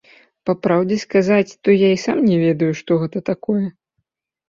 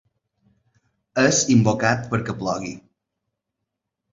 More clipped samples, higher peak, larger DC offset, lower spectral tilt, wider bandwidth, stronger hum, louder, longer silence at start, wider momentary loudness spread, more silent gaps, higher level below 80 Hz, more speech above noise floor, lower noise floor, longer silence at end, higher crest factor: neither; about the same, -2 dBFS vs -2 dBFS; neither; first, -7 dB/octave vs -4.5 dB/octave; about the same, 7.6 kHz vs 7.8 kHz; neither; about the same, -18 LUFS vs -20 LUFS; second, 0.45 s vs 1.15 s; second, 8 LU vs 13 LU; neither; about the same, -60 dBFS vs -56 dBFS; second, 57 dB vs 61 dB; second, -74 dBFS vs -81 dBFS; second, 0.8 s vs 1.35 s; second, 16 dB vs 22 dB